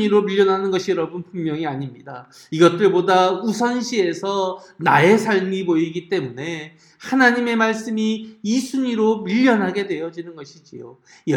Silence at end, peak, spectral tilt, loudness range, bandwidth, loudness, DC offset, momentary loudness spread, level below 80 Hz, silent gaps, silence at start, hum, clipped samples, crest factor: 0 s; 0 dBFS; -5.5 dB/octave; 3 LU; 16 kHz; -19 LUFS; under 0.1%; 20 LU; -68 dBFS; none; 0 s; none; under 0.1%; 18 dB